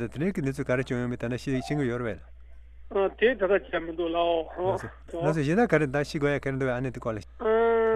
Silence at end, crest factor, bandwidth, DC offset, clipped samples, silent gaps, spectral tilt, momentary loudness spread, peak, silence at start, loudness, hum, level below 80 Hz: 0 s; 18 dB; 12.5 kHz; under 0.1%; under 0.1%; none; -7 dB/octave; 10 LU; -8 dBFS; 0 s; -27 LUFS; none; -48 dBFS